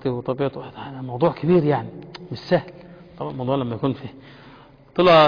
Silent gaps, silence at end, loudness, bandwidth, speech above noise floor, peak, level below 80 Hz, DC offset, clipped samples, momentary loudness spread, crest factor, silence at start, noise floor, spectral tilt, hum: none; 0 s; -23 LUFS; 5.2 kHz; 27 dB; -4 dBFS; -54 dBFS; under 0.1%; under 0.1%; 20 LU; 16 dB; 0.05 s; -47 dBFS; -8 dB/octave; none